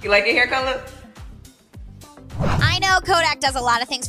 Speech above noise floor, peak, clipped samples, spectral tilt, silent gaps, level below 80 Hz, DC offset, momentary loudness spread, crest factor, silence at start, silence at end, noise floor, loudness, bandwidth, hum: 24 dB; -4 dBFS; under 0.1%; -3.5 dB/octave; none; -36 dBFS; under 0.1%; 12 LU; 18 dB; 0 s; 0 s; -43 dBFS; -18 LUFS; 15.5 kHz; none